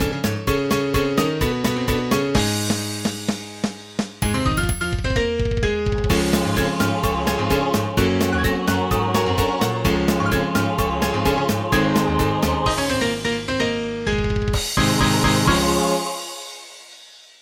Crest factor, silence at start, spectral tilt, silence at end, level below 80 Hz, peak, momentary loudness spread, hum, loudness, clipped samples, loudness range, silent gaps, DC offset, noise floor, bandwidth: 16 dB; 0 s; -5 dB/octave; 0.25 s; -32 dBFS; -4 dBFS; 7 LU; none; -20 LUFS; under 0.1%; 3 LU; none; under 0.1%; -45 dBFS; 17 kHz